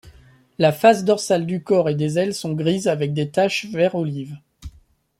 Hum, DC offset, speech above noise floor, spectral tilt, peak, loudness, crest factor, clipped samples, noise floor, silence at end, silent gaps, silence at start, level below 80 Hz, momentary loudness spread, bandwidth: none; under 0.1%; 35 dB; -5.5 dB/octave; -2 dBFS; -20 LUFS; 18 dB; under 0.1%; -55 dBFS; 0.5 s; none; 0.05 s; -52 dBFS; 10 LU; 16.5 kHz